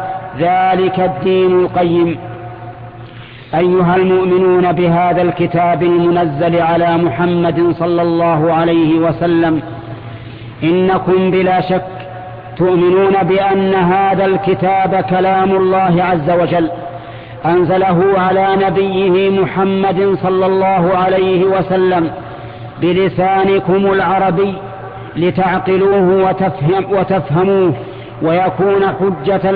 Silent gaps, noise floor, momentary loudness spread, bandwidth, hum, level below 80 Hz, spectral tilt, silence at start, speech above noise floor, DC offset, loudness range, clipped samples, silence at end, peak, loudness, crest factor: none; -32 dBFS; 16 LU; 4.8 kHz; none; -44 dBFS; -11 dB/octave; 0 s; 21 dB; under 0.1%; 2 LU; under 0.1%; 0 s; -2 dBFS; -13 LUFS; 10 dB